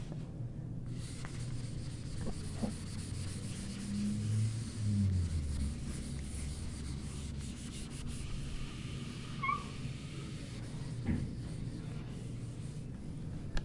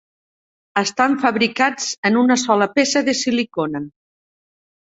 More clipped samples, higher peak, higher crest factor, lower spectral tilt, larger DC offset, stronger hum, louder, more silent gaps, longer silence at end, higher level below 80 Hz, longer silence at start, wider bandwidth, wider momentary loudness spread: neither; second, -22 dBFS vs 0 dBFS; about the same, 16 dB vs 20 dB; first, -6 dB/octave vs -3 dB/octave; neither; neither; second, -40 LUFS vs -18 LUFS; second, none vs 1.98-2.03 s; second, 0 s vs 1.05 s; first, -46 dBFS vs -62 dBFS; second, 0 s vs 0.75 s; first, 11.5 kHz vs 8 kHz; about the same, 9 LU vs 8 LU